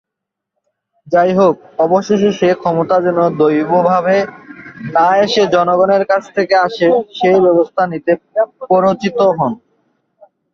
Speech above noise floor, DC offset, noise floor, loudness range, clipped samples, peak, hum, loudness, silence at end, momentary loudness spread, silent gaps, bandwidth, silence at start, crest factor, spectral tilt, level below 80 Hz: 67 dB; under 0.1%; -80 dBFS; 2 LU; under 0.1%; 0 dBFS; none; -13 LUFS; 1 s; 6 LU; none; 7.2 kHz; 1.05 s; 14 dB; -6.5 dB/octave; -56 dBFS